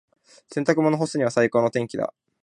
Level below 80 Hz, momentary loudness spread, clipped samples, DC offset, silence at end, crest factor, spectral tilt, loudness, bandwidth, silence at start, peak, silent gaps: -66 dBFS; 10 LU; under 0.1%; under 0.1%; 0.35 s; 18 dB; -6 dB/octave; -23 LUFS; 11 kHz; 0.5 s; -4 dBFS; none